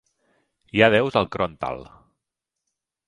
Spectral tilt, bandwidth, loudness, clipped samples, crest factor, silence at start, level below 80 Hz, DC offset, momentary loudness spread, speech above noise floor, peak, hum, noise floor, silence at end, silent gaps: -6.5 dB/octave; 11 kHz; -21 LUFS; under 0.1%; 24 dB; 0.75 s; -52 dBFS; under 0.1%; 14 LU; 63 dB; 0 dBFS; none; -84 dBFS; 1.25 s; none